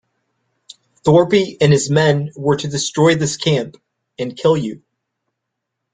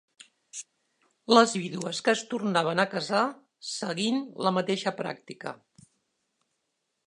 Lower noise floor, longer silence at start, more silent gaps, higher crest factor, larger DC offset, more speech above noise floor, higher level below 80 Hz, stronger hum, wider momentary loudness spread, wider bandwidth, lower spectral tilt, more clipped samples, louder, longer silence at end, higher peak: about the same, -78 dBFS vs -80 dBFS; first, 1.05 s vs 0.55 s; neither; second, 16 dB vs 26 dB; neither; first, 62 dB vs 53 dB; first, -54 dBFS vs -80 dBFS; neither; second, 10 LU vs 20 LU; second, 9.4 kHz vs 11 kHz; first, -5.5 dB/octave vs -4 dB/octave; neither; first, -16 LUFS vs -27 LUFS; second, 1.15 s vs 1.55 s; first, 0 dBFS vs -4 dBFS